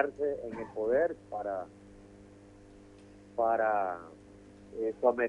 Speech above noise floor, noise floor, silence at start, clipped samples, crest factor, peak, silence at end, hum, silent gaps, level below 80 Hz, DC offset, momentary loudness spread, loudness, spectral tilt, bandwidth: 23 dB; -54 dBFS; 0 s; under 0.1%; 20 dB; -12 dBFS; 0 s; none; none; -64 dBFS; under 0.1%; 25 LU; -33 LUFS; -7.5 dB/octave; 10.5 kHz